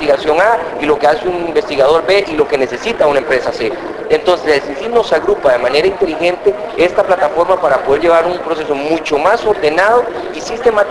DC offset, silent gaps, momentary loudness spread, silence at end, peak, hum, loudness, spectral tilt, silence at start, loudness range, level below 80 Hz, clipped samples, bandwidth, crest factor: under 0.1%; none; 6 LU; 0 s; 0 dBFS; none; -13 LUFS; -4.5 dB/octave; 0 s; 1 LU; -42 dBFS; under 0.1%; 11 kHz; 12 dB